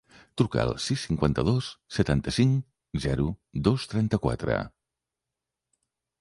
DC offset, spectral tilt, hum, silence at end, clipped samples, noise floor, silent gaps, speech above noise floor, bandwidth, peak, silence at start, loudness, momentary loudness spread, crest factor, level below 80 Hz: under 0.1%; -6.5 dB/octave; none; 1.55 s; under 0.1%; -87 dBFS; none; 61 dB; 11.5 kHz; -6 dBFS; 0.35 s; -27 LUFS; 7 LU; 20 dB; -44 dBFS